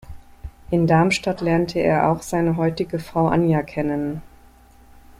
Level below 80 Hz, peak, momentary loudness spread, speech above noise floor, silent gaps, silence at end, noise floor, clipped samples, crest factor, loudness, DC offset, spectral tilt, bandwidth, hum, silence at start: -44 dBFS; -4 dBFS; 10 LU; 29 dB; none; 0.1 s; -49 dBFS; under 0.1%; 16 dB; -20 LUFS; under 0.1%; -6.5 dB/octave; 15 kHz; none; 0.05 s